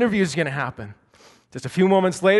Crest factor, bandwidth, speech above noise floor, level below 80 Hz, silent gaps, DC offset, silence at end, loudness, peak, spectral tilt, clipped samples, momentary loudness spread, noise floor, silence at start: 16 dB; 11.5 kHz; 33 dB; -58 dBFS; none; under 0.1%; 0 s; -21 LUFS; -4 dBFS; -6 dB/octave; under 0.1%; 21 LU; -53 dBFS; 0 s